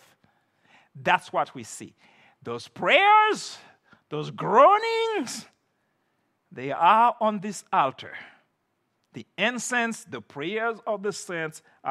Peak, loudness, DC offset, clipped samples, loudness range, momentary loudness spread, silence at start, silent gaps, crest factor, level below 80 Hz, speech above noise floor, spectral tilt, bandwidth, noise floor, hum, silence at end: -4 dBFS; -23 LUFS; under 0.1%; under 0.1%; 8 LU; 21 LU; 0.95 s; none; 22 dB; -82 dBFS; 50 dB; -3.5 dB/octave; 13.5 kHz; -74 dBFS; none; 0 s